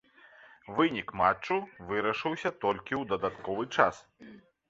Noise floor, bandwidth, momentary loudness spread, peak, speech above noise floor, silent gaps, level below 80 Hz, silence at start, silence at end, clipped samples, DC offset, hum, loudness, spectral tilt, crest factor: -57 dBFS; 7.8 kHz; 7 LU; -6 dBFS; 26 dB; none; -62 dBFS; 0.45 s; 0.3 s; under 0.1%; under 0.1%; none; -30 LUFS; -5.5 dB/octave; 26 dB